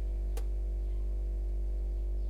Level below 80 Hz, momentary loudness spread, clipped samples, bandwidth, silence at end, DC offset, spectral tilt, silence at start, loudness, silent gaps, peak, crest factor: -32 dBFS; 0 LU; under 0.1%; 3.2 kHz; 0 s; under 0.1%; -8 dB/octave; 0 s; -37 LUFS; none; -26 dBFS; 6 dB